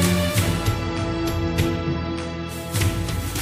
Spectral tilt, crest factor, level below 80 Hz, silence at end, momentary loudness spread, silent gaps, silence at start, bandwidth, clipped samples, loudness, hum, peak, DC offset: -5 dB/octave; 18 dB; -34 dBFS; 0 s; 7 LU; none; 0 s; 15.5 kHz; under 0.1%; -24 LUFS; none; -4 dBFS; under 0.1%